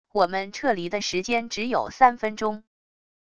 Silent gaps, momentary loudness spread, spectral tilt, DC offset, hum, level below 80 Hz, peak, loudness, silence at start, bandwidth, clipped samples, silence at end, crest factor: none; 9 LU; -3.5 dB/octave; 0.5%; none; -58 dBFS; -4 dBFS; -24 LUFS; 0.05 s; 10 kHz; under 0.1%; 0.7 s; 22 dB